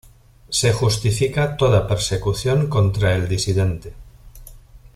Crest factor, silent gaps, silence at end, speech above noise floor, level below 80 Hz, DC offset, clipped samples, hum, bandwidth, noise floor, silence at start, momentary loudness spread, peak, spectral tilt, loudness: 16 dB; none; 0.15 s; 24 dB; -38 dBFS; under 0.1%; under 0.1%; none; 14.5 kHz; -43 dBFS; 0.5 s; 5 LU; -4 dBFS; -5 dB/octave; -19 LUFS